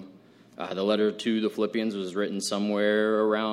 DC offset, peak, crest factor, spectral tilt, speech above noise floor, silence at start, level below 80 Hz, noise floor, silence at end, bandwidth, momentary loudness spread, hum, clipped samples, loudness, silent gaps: under 0.1%; -10 dBFS; 16 dB; -4.5 dB/octave; 27 dB; 0 s; -76 dBFS; -53 dBFS; 0 s; 14 kHz; 6 LU; none; under 0.1%; -27 LUFS; none